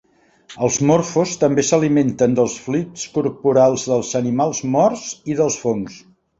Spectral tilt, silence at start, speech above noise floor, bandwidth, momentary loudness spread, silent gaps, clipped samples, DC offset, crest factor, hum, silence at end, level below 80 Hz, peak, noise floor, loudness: -5.5 dB/octave; 0.5 s; 29 dB; 8 kHz; 8 LU; none; under 0.1%; under 0.1%; 16 dB; none; 0.4 s; -54 dBFS; -2 dBFS; -46 dBFS; -18 LUFS